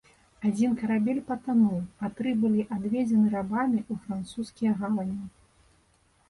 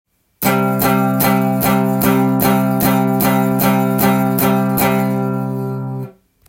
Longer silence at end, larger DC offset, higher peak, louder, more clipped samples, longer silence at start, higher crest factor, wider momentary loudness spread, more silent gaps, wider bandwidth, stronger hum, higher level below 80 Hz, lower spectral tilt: first, 1 s vs 0.4 s; neither; second, -14 dBFS vs 0 dBFS; second, -28 LUFS vs -15 LUFS; neither; about the same, 0.4 s vs 0.4 s; about the same, 14 dB vs 14 dB; first, 11 LU vs 7 LU; neither; second, 11.5 kHz vs 17 kHz; neither; second, -62 dBFS vs -46 dBFS; first, -7.5 dB/octave vs -6 dB/octave